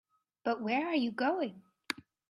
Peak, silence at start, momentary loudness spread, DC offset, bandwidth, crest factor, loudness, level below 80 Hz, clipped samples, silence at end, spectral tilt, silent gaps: -14 dBFS; 0.45 s; 10 LU; under 0.1%; 13.5 kHz; 22 dB; -34 LUFS; -80 dBFS; under 0.1%; 0.35 s; -5 dB/octave; none